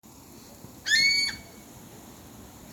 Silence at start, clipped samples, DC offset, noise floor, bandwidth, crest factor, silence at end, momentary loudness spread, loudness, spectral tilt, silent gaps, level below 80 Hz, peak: 0.3 s; under 0.1%; under 0.1%; -49 dBFS; over 20 kHz; 20 dB; 0 s; 27 LU; -23 LUFS; 0 dB/octave; none; -60 dBFS; -12 dBFS